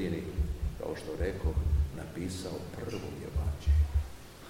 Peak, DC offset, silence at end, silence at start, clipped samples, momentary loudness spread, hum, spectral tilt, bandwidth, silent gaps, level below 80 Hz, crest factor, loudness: -18 dBFS; 0.2%; 0 s; 0 s; under 0.1%; 10 LU; none; -7 dB/octave; 15.5 kHz; none; -34 dBFS; 14 dB; -34 LUFS